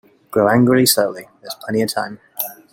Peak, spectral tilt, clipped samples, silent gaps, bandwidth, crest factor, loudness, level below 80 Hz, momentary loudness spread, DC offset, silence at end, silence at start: 0 dBFS; -4 dB/octave; under 0.1%; none; 17 kHz; 18 dB; -17 LUFS; -56 dBFS; 17 LU; under 0.1%; 0.2 s; 0.3 s